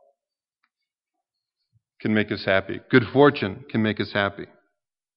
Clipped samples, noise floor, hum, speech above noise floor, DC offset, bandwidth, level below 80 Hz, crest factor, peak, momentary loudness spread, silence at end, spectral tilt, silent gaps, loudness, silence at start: under 0.1%; -87 dBFS; none; 65 dB; under 0.1%; 5.6 kHz; -64 dBFS; 22 dB; -2 dBFS; 10 LU; 0.7 s; -4.5 dB/octave; none; -22 LUFS; 2.05 s